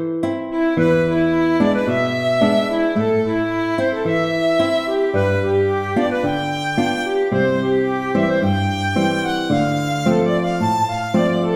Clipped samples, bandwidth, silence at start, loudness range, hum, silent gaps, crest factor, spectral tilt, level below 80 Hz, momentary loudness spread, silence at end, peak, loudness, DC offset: under 0.1%; 15 kHz; 0 s; 1 LU; none; none; 14 dB; -6.5 dB/octave; -48 dBFS; 4 LU; 0 s; -4 dBFS; -18 LUFS; under 0.1%